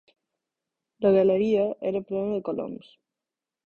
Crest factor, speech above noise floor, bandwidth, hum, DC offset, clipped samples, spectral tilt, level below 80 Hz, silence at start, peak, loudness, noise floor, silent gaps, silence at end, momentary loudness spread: 16 dB; 65 dB; 6.6 kHz; none; under 0.1%; under 0.1%; -9 dB/octave; -66 dBFS; 1 s; -10 dBFS; -25 LUFS; -89 dBFS; none; 0.9 s; 13 LU